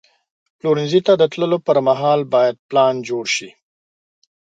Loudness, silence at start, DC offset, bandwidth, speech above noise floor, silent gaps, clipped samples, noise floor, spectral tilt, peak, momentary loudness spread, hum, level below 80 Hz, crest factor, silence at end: -17 LUFS; 0.65 s; under 0.1%; 9.2 kHz; over 74 dB; 2.59-2.69 s; under 0.1%; under -90 dBFS; -5 dB/octave; -2 dBFS; 6 LU; none; -68 dBFS; 16 dB; 1.1 s